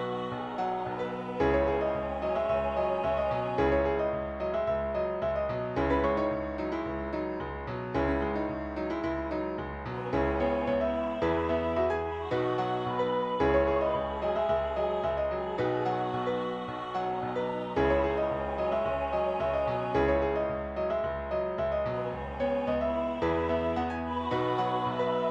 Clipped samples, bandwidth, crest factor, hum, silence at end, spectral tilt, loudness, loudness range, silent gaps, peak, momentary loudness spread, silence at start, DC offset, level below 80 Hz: under 0.1%; 8 kHz; 16 dB; none; 0 s; -8 dB/octave; -30 LUFS; 2 LU; none; -14 dBFS; 7 LU; 0 s; under 0.1%; -44 dBFS